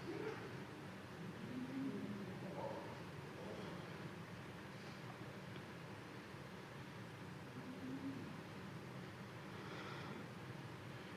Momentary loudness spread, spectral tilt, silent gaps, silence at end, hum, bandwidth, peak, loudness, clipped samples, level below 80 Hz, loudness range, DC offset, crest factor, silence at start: 6 LU; -6 dB/octave; none; 0 s; none; 15 kHz; -34 dBFS; -51 LUFS; under 0.1%; -74 dBFS; 4 LU; under 0.1%; 16 dB; 0 s